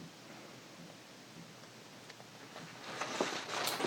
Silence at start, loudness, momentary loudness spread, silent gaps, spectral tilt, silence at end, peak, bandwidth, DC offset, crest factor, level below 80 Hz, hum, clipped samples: 0 s; -44 LUFS; 16 LU; none; -2.5 dB/octave; 0 s; -18 dBFS; 19 kHz; under 0.1%; 26 dB; -86 dBFS; none; under 0.1%